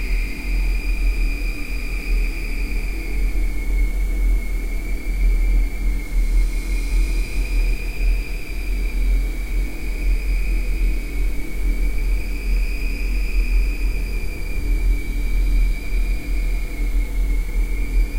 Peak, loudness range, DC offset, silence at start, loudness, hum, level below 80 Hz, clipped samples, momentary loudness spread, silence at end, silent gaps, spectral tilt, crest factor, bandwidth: -8 dBFS; 1 LU; under 0.1%; 0 s; -25 LUFS; none; -20 dBFS; under 0.1%; 5 LU; 0 s; none; -5.5 dB/octave; 10 dB; 16 kHz